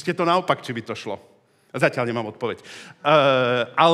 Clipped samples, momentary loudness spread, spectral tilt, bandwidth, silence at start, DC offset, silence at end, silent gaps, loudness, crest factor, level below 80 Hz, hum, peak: under 0.1%; 18 LU; -5.5 dB/octave; 13.5 kHz; 0 s; under 0.1%; 0 s; none; -22 LUFS; 20 dB; -74 dBFS; none; -2 dBFS